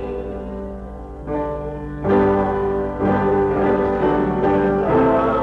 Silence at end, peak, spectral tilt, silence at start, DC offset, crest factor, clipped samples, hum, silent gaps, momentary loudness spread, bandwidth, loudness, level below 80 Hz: 0 s; -8 dBFS; -9.5 dB/octave; 0 s; under 0.1%; 10 dB; under 0.1%; none; none; 14 LU; 5.4 kHz; -19 LUFS; -36 dBFS